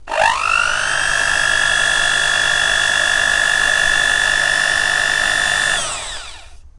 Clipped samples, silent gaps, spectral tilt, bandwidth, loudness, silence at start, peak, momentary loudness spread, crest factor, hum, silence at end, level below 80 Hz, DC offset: under 0.1%; none; 0.5 dB/octave; 11.5 kHz; -14 LUFS; 0 s; 0 dBFS; 3 LU; 16 dB; none; 0.1 s; -38 dBFS; under 0.1%